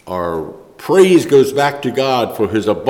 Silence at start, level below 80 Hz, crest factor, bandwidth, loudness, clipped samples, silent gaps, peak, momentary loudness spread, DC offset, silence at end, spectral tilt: 0.05 s; -50 dBFS; 12 dB; 17 kHz; -14 LUFS; under 0.1%; none; -2 dBFS; 14 LU; under 0.1%; 0 s; -5.5 dB/octave